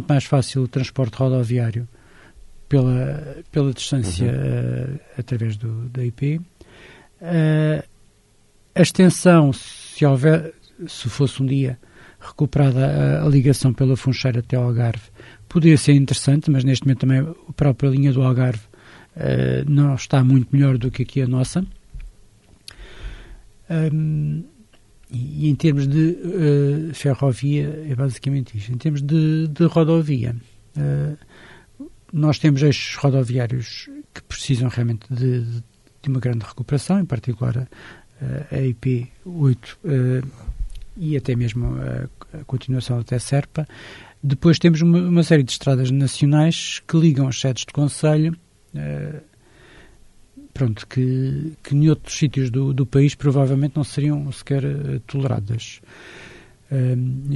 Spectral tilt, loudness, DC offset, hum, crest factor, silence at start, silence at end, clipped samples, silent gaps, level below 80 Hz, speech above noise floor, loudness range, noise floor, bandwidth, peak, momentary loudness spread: -7 dB/octave; -20 LUFS; under 0.1%; none; 18 dB; 0 s; 0 s; under 0.1%; none; -44 dBFS; 37 dB; 7 LU; -55 dBFS; 11.5 kHz; -2 dBFS; 15 LU